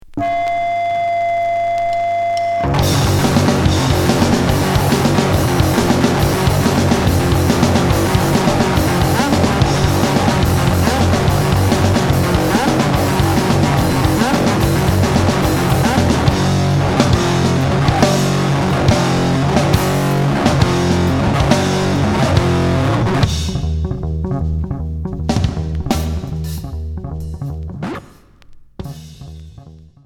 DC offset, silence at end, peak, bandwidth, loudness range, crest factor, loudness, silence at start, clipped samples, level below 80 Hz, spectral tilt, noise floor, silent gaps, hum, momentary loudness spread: under 0.1%; 0.3 s; 0 dBFS; 18.5 kHz; 7 LU; 14 dB; -15 LUFS; 0.1 s; under 0.1%; -26 dBFS; -5.5 dB/octave; -42 dBFS; none; none; 9 LU